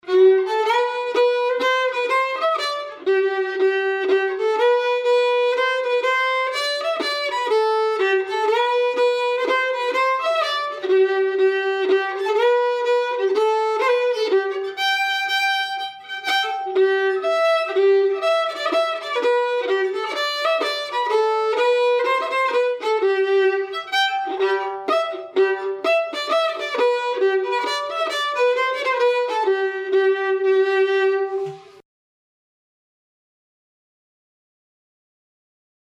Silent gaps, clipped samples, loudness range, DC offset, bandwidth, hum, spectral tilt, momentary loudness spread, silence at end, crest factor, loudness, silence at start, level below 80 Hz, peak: none; under 0.1%; 2 LU; under 0.1%; 13.5 kHz; none; -2 dB/octave; 4 LU; 4.2 s; 14 dB; -20 LUFS; 0.05 s; -82 dBFS; -6 dBFS